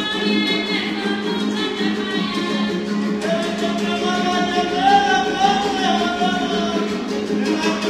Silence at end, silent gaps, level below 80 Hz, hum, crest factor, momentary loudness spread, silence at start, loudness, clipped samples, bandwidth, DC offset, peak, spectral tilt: 0 s; none; -52 dBFS; none; 16 dB; 5 LU; 0 s; -19 LUFS; under 0.1%; 13.5 kHz; under 0.1%; -2 dBFS; -4.5 dB/octave